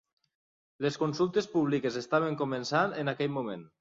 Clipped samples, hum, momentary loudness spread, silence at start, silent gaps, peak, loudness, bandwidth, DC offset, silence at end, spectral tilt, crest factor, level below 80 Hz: under 0.1%; none; 5 LU; 0.8 s; none; -12 dBFS; -30 LUFS; 7.8 kHz; under 0.1%; 0.15 s; -6 dB/octave; 18 dB; -72 dBFS